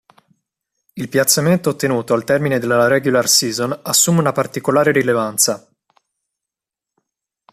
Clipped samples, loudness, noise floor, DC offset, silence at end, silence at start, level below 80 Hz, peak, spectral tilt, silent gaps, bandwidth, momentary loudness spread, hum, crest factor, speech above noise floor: under 0.1%; -15 LUFS; -86 dBFS; under 0.1%; 1.95 s; 0.95 s; -58 dBFS; 0 dBFS; -3.5 dB/octave; none; 15 kHz; 7 LU; none; 18 dB; 70 dB